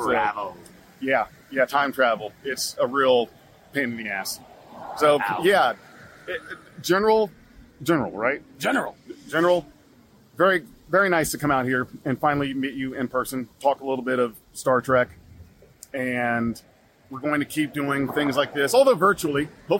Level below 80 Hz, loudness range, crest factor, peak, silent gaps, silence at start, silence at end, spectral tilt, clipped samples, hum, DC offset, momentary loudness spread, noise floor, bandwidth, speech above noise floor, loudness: -58 dBFS; 3 LU; 18 dB; -6 dBFS; none; 0 s; 0 s; -4.5 dB/octave; under 0.1%; none; under 0.1%; 13 LU; -54 dBFS; 16.5 kHz; 31 dB; -23 LUFS